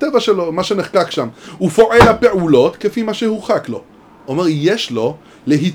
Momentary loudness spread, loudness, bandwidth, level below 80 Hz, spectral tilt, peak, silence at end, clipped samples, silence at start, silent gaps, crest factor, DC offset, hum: 13 LU; -14 LUFS; 19.5 kHz; -38 dBFS; -6 dB/octave; 0 dBFS; 0 s; 0.3%; 0 s; none; 14 dB; under 0.1%; none